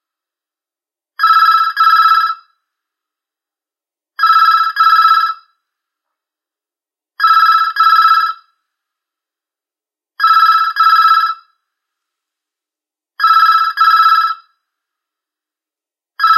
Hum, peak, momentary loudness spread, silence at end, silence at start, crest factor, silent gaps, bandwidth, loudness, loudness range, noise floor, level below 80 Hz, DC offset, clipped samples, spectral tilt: none; 0 dBFS; 11 LU; 0 s; 1.2 s; 14 dB; none; 14 kHz; -10 LUFS; 0 LU; -90 dBFS; under -90 dBFS; under 0.1%; under 0.1%; 9.5 dB/octave